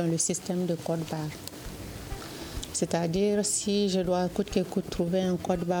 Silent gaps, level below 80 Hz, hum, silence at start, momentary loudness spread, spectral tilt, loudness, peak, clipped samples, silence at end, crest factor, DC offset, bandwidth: none; -48 dBFS; none; 0 s; 13 LU; -4.5 dB/octave; -29 LUFS; -12 dBFS; under 0.1%; 0 s; 18 dB; under 0.1%; over 20 kHz